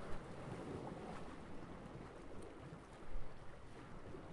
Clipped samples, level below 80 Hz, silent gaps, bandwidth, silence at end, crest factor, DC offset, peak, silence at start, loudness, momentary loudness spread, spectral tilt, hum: under 0.1%; -56 dBFS; none; 11 kHz; 0 s; 16 dB; under 0.1%; -30 dBFS; 0 s; -53 LUFS; 7 LU; -6.5 dB/octave; none